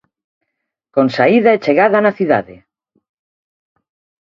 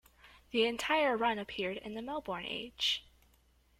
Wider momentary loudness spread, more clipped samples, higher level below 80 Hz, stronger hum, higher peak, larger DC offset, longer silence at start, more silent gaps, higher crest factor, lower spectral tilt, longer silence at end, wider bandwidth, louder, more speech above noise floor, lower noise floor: second, 6 LU vs 10 LU; neither; first, -60 dBFS vs -66 dBFS; neither; first, 0 dBFS vs -18 dBFS; neither; first, 0.95 s vs 0.25 s; neither; about the same, 16 dB vs 18 dB; first, -7.5 dB/octave vs -3 dB/octave; first, 1.7 s vs 0.8 s; second, 7.4 kHz vs 16.5 kHz; first, -13 LUFS vs -34 LUFS; first, 63 dB vs 34 dB; first, -76 dBFS vs -68 dBFS